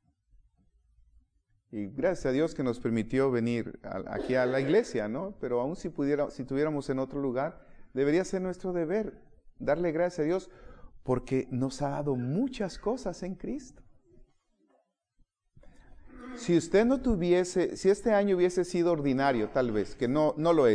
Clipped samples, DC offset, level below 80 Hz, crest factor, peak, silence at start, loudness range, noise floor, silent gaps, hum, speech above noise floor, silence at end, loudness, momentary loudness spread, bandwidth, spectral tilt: under 0.1%; under 0.1%; -52 dBFS; 18 dB; -12 dBFS; 1.75 s; 8 LU; -72 dBFS; none; none; 44 dB; 0 s; -30 LUFS; 11 LU; 10.5 kHz; -6.5 dB/octave